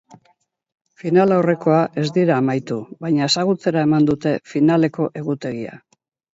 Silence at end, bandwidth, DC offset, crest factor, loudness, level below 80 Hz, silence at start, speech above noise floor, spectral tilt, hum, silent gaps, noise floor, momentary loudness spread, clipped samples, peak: 0.55 s; 7.8 kHz; under 0.1%; 16 dB; -18 LUFS; -62 dBFS; 1.05 s; 44 dB; -6.5 dB/octave; none; none; -62 dBFS; 11 LU; under 0.1%; -2 dBFS